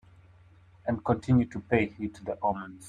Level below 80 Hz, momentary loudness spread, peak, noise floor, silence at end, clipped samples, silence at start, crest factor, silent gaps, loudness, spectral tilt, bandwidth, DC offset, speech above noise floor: -56 dBFS; 11 LU; -8 dBFS; -57 dBFS; 0 s; under 0.1%; 0.85 s; 22 dB; none; -29 LUFS; -8 dB/octave; 10.5 kHz; under 0.1%; 28 dB